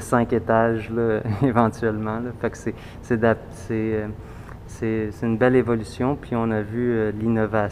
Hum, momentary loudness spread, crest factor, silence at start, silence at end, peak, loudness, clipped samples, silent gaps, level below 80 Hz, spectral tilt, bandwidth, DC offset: none; 12 LU; 20 dB; 0 s; 0 s; -2 dBFS; -23 LUFS; under 0.1%; none; -44 dBFS; -7.5 dB/octave; 13.5 kHz; under 0.1%